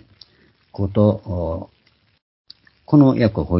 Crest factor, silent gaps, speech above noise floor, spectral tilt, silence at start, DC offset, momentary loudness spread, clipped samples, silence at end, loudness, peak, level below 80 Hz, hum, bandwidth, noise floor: 20 dB; 2.22-2.45 s; 40 dB; -13 dB/octave; 0.75 s; under 0.1%; 14 LU; under 0.1%; 0 s; -18 LUFS; 0 dBFS; -38 dBFS; none; 5.8 kHz; -57 dBFS